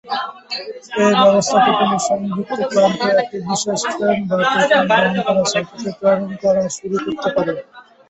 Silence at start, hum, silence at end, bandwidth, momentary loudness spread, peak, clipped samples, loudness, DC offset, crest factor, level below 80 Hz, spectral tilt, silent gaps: 0.05 s; none; 0.3 s; 8.4 kHz; 11 LU; -2 dBFS; under 0.1%; -17 LUFS; under 0.1%; 16 dB; -58 dBFS; -4 dB/octave; none